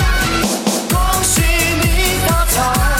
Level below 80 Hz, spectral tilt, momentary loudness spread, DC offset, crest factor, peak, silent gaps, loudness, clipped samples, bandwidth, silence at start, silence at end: -20 dBFS; -3.5 dB/octave; 3 LU; under 0.1%; 12 dB; -2 dBFS; none; -14 LUFS; under 0.1%; 17 kHz; 0 s; 0 s